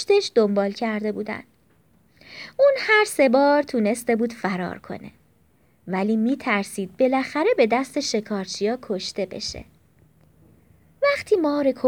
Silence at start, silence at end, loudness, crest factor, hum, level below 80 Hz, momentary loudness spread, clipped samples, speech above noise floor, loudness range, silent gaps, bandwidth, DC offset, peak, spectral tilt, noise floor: 0 s; 0 s; -22 LUFS; 18 dB; none; -60 dBFS; 13 LU; under 0.1%; 39 dB; 5 LU; none; 19.5 kHz; under 0.1%; -6 dBFS; -4.5 dB/octave; -61 dBFS